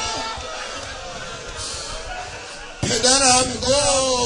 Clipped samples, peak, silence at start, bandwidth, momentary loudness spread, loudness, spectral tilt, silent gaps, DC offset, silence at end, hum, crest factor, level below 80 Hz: under 0.1%; 0 dBFS; 0 s; 11 kHz; 17 LU; -19 LUFS; -1.5 dB/octave; none; under 0.1%; 0 s; none; 22 dB; -40 dBFS